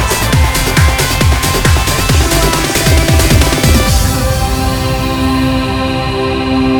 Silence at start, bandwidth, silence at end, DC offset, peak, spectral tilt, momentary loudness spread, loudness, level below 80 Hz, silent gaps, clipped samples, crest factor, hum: 0 s; over 20 kHz; 0 s; under 0.1%; 0 dBFS; -4.5 dB/octave; 5 LU; -11 LUFS; -16 dBFS; none; under 0.1%; 10 dB; none